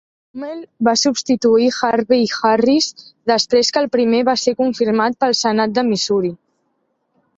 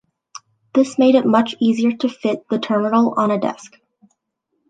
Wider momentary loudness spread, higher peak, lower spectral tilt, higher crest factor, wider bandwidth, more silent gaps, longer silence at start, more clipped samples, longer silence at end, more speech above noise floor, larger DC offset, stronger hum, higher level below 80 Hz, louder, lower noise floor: about the same, 10 LU vs 8 LU; about the same, -2 dBFS vs -2 dBFS; second, -3.5 dB/octave vs -6 dB/octave; about the same, 14 dB vs 16 dB; second, 8 kHz vs 9.2 kHz; neither; second, 0.35 s vs 0.75 s; neither; about the same, 1.05 s vs 1.05 s; second, 51 dB vs 56 dB; neither; neither; first, -60 dBFS vs -68 dBFS; about the same, -16 LUFS vs -17 LUFS; second, -67 dBFS vs -73 dBFS